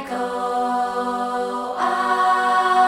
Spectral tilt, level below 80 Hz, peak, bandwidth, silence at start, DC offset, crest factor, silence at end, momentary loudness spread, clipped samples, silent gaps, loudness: -3 dB/octave; -60 dBFS; -6 dBFS; 15 kHz; 0 s; under 0.1%; 14 dB; 0 s; 7 LU; under 0.1%; none; -21 LUFS